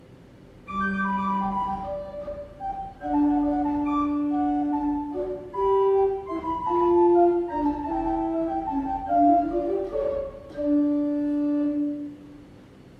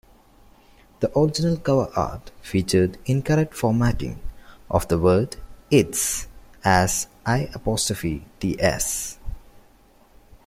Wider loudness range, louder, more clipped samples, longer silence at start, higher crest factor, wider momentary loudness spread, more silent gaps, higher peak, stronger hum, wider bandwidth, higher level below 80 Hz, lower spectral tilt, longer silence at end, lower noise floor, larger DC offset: about the same, 4 LU vs 2 LU; about the same, -25 LUFS vs -23 LUFS; neither; second, 0.1 s vs 1 s; about the same, 16 dB vs 20 dB; about the same, 13 LU vs 13 LU; neither; second, -10 dBFS vs -4 dBFS; neither; second, 4.9 kHz vs 16.5 kHz; second, -48 dBFS vs -40 dBFS; first, -9 dB/octave vs -5 dB/octave; second, 0.05 s vs 0.9 s; second, -49 dBFS vs -54 dBFS; neither